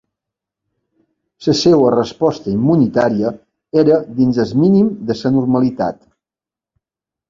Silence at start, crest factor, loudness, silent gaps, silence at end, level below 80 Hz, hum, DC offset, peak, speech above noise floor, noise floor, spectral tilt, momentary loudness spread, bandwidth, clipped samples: 1.4 s; 16 dB; -15 LUFS; none; 1.35 s; -50 dBFS; none; under 0.1%; 0 dBFS; 75 dB; -89 dBFS; -7 dB/octave; 8 LU; 7.6 kHz; under 0.1%